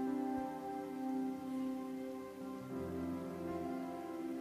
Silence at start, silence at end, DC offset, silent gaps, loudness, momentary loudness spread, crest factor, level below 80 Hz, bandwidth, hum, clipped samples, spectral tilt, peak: 0 s; 0 s; under 0.1%; none; -43 LUFS; 5 LU; 12 dB; -74 dBFS; 15 kHz; none; under 0.1%; -7 dB/octave; -30 dBFS